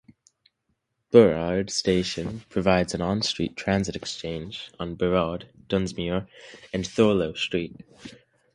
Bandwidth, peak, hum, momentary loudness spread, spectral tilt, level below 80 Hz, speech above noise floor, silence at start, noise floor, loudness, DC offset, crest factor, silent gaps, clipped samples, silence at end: 11.5 kHz; -2 dBFS; none; 17 LU; -5 dB/octave; -48 dBFS; 51 dB; 1.1 s; -76 dBFS; -25 LUFS; under 0.1%; 24 dB; none; under 0.1%; 0.45 s